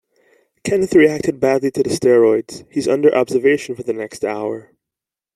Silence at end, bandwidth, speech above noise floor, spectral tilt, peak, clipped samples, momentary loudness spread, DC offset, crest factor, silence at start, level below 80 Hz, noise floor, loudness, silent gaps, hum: 0.75 s; 13 kHz; 70 dB; -5.5 dB/octave; -2 dBFS; under 0.1%; 12 LU; under 0.1%; 16 dB; 0.65 s; -56 dBFS; -86 dBFS; -17 LUFS; none; none